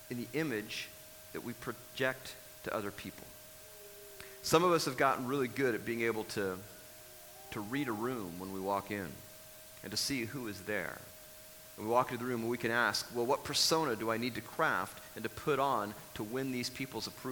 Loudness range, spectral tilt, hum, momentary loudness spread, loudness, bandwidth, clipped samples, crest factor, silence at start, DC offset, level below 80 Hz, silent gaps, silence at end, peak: 7 LU; -3.5 dB/octave; none; 20 LU; -35 LUFS; 19.5 kHz; under 0.1%; 24 dB; 0 s; under 0.1%; -68 dBFS; none; 0 s; -12 dBFS